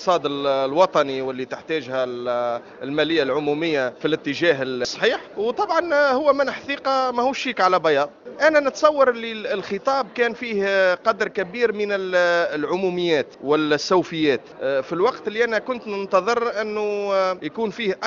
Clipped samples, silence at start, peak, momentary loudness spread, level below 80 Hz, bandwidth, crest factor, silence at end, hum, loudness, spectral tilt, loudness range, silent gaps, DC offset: under 0.1%; 0 s; -2 dBFS; 8 LU; -64 dBFS; 7.4 kHz; 20 dB; 0 s; none; -21 LUFS; -4.5 dB/octave; 3 LU; none; under 0.1%